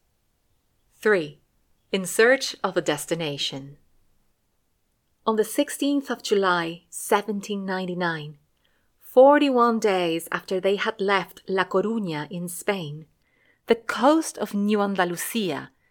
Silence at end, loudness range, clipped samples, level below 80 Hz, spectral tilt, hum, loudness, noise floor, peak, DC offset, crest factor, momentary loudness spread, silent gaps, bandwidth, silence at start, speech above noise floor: 0.25 s; 5 LU; under 0.1%; -68 dBFS; -4 dB/octave; none; -23 LUFS; -70 dBFS; -4 dBFS; under 0.1%; 20 dB; 11 LU; none; 19 kHz; 1 s; 47 dB